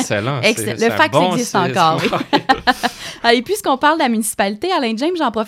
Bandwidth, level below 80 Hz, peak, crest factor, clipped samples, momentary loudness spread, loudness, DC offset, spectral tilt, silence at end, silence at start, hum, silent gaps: 16.5 kHz; -50 dBFS; 0 dBFS; 16 dB; under 0.1%; 5 LU; -16 LUFS; under 0.1%; -4 dB/octave; 0 s; 0 s; none; none